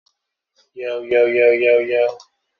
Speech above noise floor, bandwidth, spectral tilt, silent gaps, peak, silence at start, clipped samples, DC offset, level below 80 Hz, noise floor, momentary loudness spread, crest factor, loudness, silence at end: 56 dB; 6.2 kHz; -2 dB/octave; none; -4 dBFS; 0.75 s; under 0.1%; under 0.1%; -66 dBFS; -72 dBFS; 13 LU; 16 dB; -16 LUFS; 0.4 s